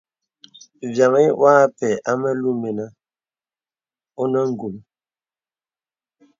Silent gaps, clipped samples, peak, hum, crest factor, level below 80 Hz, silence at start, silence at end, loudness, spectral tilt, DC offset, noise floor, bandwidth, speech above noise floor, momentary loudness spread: none; under 0.1%; -2 dBFS; none; 20 dB; -68 dBFS; 0.8 s; 1.6 s; -18 LUFS; -6.5 dB/octave; under 0.1%; under -90 dBFS; 7.6 kHz; over 72 dB; 18 LU